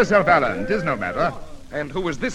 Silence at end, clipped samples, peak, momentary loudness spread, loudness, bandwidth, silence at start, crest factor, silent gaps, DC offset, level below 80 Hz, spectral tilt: 0 s; under 0.1%; -2 dBFS; 14 LU; -21 LUFS; 12 kHz; 0 s; 18 dB; none; under 0.1%; -40 dBFS; -6 dB/octave